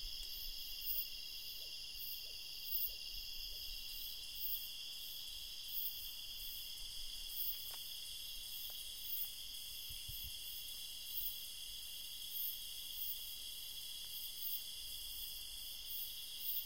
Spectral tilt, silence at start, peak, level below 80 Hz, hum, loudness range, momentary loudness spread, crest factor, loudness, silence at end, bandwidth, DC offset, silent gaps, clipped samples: 1 dB/octave; 0 s; -26 dBFS; -60 dBFS; none; 2 LU; 6 LU; 22 dB; -43 LUFS; 0 s; 16 kHz; 0.1%; none; under 0.1%